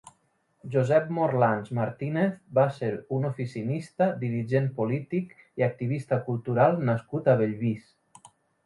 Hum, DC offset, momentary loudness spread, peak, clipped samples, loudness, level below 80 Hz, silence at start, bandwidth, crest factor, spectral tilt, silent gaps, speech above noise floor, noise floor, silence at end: none; under 0.1%; 9 LU; -8 dBFS; under 0.1%; -27 LUFS; -66 dBFS; 0.65 s; 11.5 kHz; 18 dB; -9 dB/octave; none; 43 dB; -69 dBFS; 0.4 s